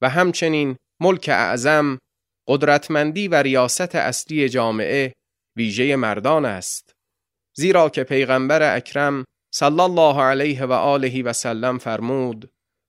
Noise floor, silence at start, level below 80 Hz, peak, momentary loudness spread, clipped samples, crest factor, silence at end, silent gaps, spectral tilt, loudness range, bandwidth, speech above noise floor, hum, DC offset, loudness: -83 dBFS; 0 s; -64 dBFS; -2 dBFS; 10 LU; under 0.1%; 18 dB; 0.45 s; none; -4.5 dB/octave; 3 LU; 16 kHz; 64 dB; none; under 0.1%; -19 LUFS